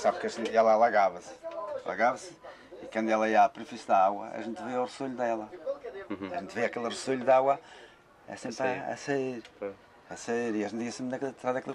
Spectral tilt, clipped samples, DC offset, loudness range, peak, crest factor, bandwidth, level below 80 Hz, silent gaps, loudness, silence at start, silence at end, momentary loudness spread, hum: -4.5 dB/octave; under 0.1%; under 0.1%; 6 LU; -12 dBFS; 18 dB; 11 kHz; -72 dBFS; none; -30 LUFS; 0 s; 0 s; 17 LU; none